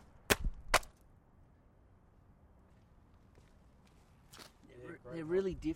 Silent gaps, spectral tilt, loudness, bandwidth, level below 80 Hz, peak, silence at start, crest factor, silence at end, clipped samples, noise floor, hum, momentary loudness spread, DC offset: none; -3.5 dB/octave; -35 LUFS; 16 kHz; -50 dBFS; -8 dBFS; 0.3 s; 34 dB; 0 s; under 0.1%; -64 dBFS; none; 22 LU; under 0.1%